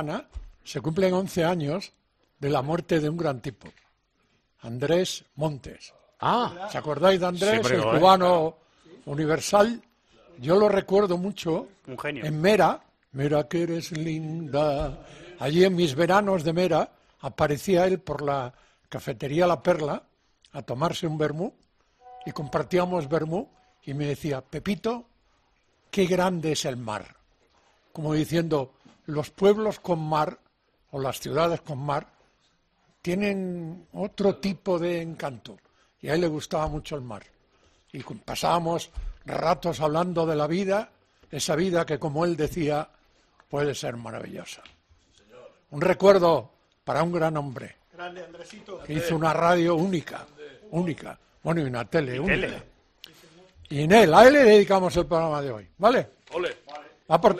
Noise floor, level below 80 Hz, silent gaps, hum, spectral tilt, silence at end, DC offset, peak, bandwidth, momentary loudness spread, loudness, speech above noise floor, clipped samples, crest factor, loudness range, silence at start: -69 dBFS; -52 dBFS; none; none; -5.5 dB/octave; 0 s; under 0.1%; -2 dBFS; 14 kHz; 19 LU; -25 LUFS; 45 dB; under 0.1%; 24 dB; 10 LU; 0 s